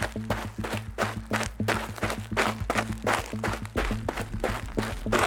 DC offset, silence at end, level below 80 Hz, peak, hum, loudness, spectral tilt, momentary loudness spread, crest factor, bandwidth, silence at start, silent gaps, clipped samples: under 0.1%; 0 s; -40 dBFS; -8 dBFS; none; -30 LUFS; -4.5 dB/octave; 5 LU; 20 dB; 18.5 kHz; 0 s; none; under 0.1%